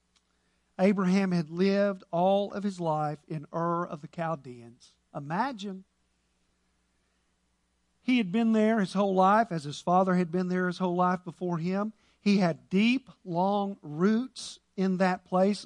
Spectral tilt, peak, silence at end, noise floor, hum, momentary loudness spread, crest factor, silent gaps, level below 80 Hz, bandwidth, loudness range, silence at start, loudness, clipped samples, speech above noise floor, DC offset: -7 dB/octave; -10 dBFS; 0 s; -73 dBFS; none; 13 LU; 18 dB; none; -72 dBFS; 10.5 kHz; 11 LU; 0.8 s; -28 LUFS; under 0.1%; 46 dB; under 0.1%